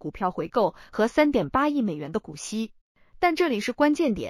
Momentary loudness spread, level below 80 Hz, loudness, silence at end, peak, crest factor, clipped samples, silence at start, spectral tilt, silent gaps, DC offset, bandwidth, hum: 10 LU; -52 dBFS; -25 LUFS; 0 s; -6 dBFS; 20 dB; under 0.1%; 0.05 s; -5.5 dB/octave; 2.81-2.95 s; under 0.1%; 14.5 kHz; none